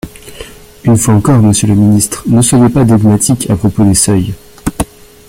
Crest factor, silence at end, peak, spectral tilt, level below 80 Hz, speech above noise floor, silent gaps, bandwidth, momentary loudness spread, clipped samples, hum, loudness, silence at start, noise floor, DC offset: 10 dB; 0.45 s; 0 dBFS; -5.5 dB/octave; -32 dBFS; 23 dB; none; 16.5 kHz; 13 LU; under 0.1%; none; -9 LUFS; 0.05 s; -31 dBFS; under 0.1%